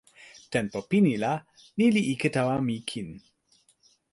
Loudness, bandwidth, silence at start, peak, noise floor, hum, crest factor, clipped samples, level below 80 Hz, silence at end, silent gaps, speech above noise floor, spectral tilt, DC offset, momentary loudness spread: -27 LUFS; 11.5 kHz; 0.2 s; -10 dBFS; -66 dBFS; none; 18 dB; under 0.1%; -64 dBFS; 0.95 s; none; 39 dB; -6 dB/octave; under 0.1%; 13 LU